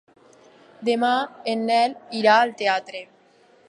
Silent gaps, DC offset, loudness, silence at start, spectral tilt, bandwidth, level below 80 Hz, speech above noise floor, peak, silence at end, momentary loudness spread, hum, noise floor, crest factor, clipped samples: none; under 0.1%; -21 LUFS; 0.8 s; -4 dB/octave; 11.5 kHz; -80 dBFS; 35 dB; -4 dBFS; 0.65 s; 11 LU; none; -56 dBFS; 20 dB; under 0.1%